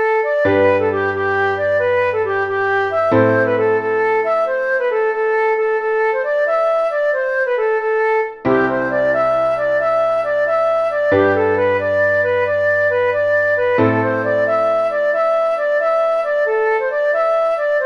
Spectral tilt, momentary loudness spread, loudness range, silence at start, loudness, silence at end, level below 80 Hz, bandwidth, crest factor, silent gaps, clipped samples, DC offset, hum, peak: -7 dB/octave; 3 LU; 1 LU; 0 s; -16 LUFS; 0 s; -56 dBFS; 7 kHz; 14 dB; none; under 0.1%; under 0.1%; none; -2 dBFS